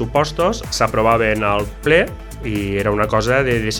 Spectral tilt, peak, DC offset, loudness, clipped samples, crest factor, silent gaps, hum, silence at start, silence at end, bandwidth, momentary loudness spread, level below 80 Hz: -5 dB/octave; 0 dBFS; under 0.1%; -17 LUFS; under 0.1%; 18 dB; none; none; 0 s; 0 s; 19 kHz; 7 LU; -32 dBFS